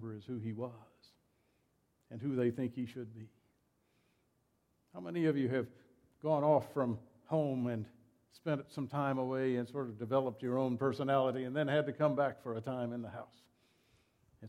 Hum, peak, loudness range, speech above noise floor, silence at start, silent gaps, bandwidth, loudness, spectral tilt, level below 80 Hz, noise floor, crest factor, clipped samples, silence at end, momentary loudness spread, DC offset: none; -18 dBFS; 8 LU; 41 dB; 0 s; none; 13 kHz; -36 LUFS; -8.5 dB/octave; -78 dBFS; -77 dBFS; 20 dB; under 0.1%; 0 s; 14 LU; under 0.1%